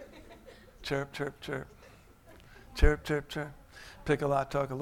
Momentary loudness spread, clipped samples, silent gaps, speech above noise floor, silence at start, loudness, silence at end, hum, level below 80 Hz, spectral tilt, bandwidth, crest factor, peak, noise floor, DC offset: 23 LU; under 0.1%; none; 26 dB; 0 s; -33 LUFS; 0 s; none; -36 dBFS; -6 dB/octave; 15.5 kHz; 24 dB; -8 dBFS; -56 dBFS; under 0.1%